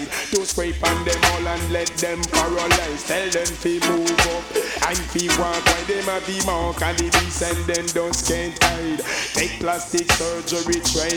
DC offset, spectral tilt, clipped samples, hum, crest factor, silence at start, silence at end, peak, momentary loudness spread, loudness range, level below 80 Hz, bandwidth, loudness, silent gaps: under 0.1%; -2.5 dB/octave; under 0.1%; none; 20 dB; 0 s; 0 s; -2 dBFS; 5 LU; 1 LU; -34 dBFS; 20 kHz; -20 LUFS; none